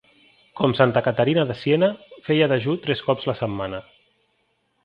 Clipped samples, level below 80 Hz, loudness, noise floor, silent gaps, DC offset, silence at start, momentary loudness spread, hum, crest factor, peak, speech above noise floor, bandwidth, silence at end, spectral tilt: under 0.1%; -56 dBFS; -21 LUFS; -69 dBFS; none; under 0.1%; 0.55 s; 10 LU; none; 20 dB; -2 dBFS; 48 dB; 5.6 kHz; 1.05 s; -9 dB/octave